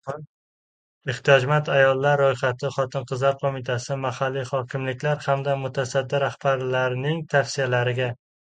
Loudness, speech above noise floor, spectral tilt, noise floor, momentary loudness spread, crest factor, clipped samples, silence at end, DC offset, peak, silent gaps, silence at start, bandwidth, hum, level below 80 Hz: -23 LUFS; over 67 dB; -5.5 dB/octave; under -90 dBFS; 9 LU; 22 dB; under 0.1%; 0.4 s; under 0.1%; 0 dBFS; 0.29-1.01 s; 0.05 s; 9.2 kHz; none; -64 dBFS